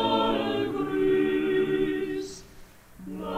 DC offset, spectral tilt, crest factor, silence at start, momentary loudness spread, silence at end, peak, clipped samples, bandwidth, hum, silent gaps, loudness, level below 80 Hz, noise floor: under 0.1%; -5.5 dB/octave; 14 dB; 0 s; 16 LU; 0 s; -12 dBFS; under 0.1%; 15 kHz; none; none; -26 LUFS; -52 dBFS; -49 dBFS